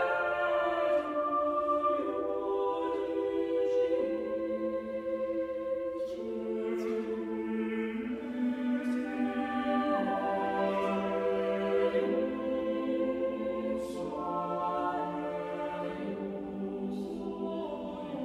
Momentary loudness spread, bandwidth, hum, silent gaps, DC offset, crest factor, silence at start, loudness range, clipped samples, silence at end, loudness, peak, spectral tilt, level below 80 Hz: 7 LU; 11.5 kHz; none; none; under 0.1%; 14 dB; 0 s; 4 LU; under 0.1%; 0 s; -33 LUFS; -18 dBFS; -7 dB/octave; -64 dBFS